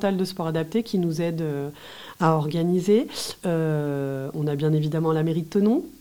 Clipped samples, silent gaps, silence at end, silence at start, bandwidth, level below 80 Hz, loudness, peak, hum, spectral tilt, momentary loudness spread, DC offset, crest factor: under 0.1%; none; 0.05 s; 0 s; 17 kHz; -60 dBFS; -24 LUFS; -6 dBFS; none; -7 dB/octave; 7 LU; 0.2%; 18 dB